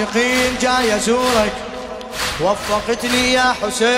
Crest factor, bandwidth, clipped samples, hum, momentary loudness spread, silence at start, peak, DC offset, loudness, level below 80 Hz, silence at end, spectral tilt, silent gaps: 14 dB; 16 kHz; under 0.1%; none; 10 LU; 0 s; -2 dBFS; under 0.1%; -16 LUFS; -40 dBFS; 0 s; -2.5 dB/octave; none